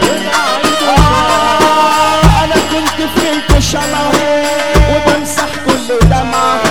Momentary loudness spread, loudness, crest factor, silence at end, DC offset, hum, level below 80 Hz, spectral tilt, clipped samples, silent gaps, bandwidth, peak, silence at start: 5 LU; -10 LUFS; 10 dB; 0 s; 4%; none; -18 dBFS; -4.5 dB/octave; 0.2%; none; 18.5 kHz; 0 dBFS; 0 s